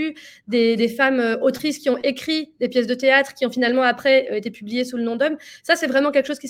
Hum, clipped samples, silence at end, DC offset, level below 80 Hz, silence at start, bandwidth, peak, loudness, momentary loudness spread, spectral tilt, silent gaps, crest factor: none; under 0.1%; 0 s; under 0.1%; -66 dBFS; 0 s; 16 kHz; -2 dBFS; -20 LUFS; 9 LU; -4 dB/octave; none; 20 dB